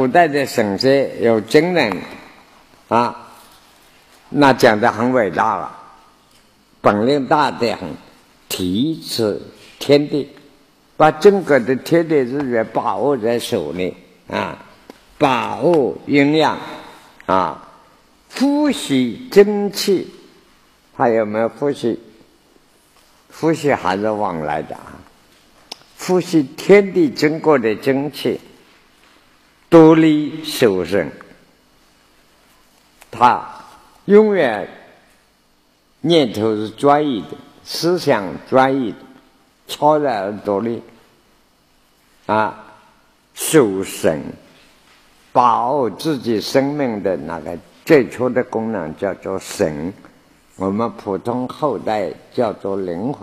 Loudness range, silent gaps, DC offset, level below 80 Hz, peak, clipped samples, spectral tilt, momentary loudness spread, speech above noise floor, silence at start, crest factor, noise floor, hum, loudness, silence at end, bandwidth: 6 LU; none; under 0.1%; -56 dBFS; 0 dBFS; under 0.1%; -5.5 dB/octave; 15 LU; 41 dB; 0 s; 18 dB; -57 dBFS; none; -17 LUFS; 0 s; 15 kHz